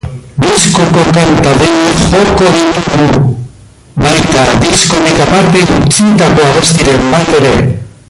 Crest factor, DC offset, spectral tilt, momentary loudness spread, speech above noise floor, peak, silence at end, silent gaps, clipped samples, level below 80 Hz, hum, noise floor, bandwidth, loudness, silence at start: 8 dB; under 0.1%; -4.5 dB/octave; 6 LU; 27 dB; 0 dBFS; 0.2 s; none; 0.2%; -26 dBFS; none; -34 dBFS; 16 kHz; -7 LUFS; 0.05 s